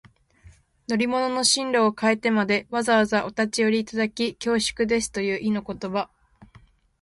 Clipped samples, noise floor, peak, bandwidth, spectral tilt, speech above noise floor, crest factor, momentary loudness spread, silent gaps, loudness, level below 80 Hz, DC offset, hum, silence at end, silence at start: under 0.1%; -55 dBFS; -6 dBFS; 11.5 kHz; -3.5 dB/octave; 32 dB; 18 dB; 8 LU; none; -23 LUFS; -56 dBFS; under 0.1%; none; 0.95 s; 0.45 s